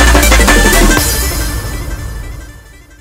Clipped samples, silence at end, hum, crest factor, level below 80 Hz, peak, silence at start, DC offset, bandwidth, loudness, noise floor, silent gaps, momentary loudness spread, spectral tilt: 0.3%; 0.45 s; none; 10 dB; -14 dBFS; 0 dBFS; 0 s; under 0.1%; 16.5 kHz; -9 LUFS; -35 dBFS; none; 19 LU; -3.5 dB/octave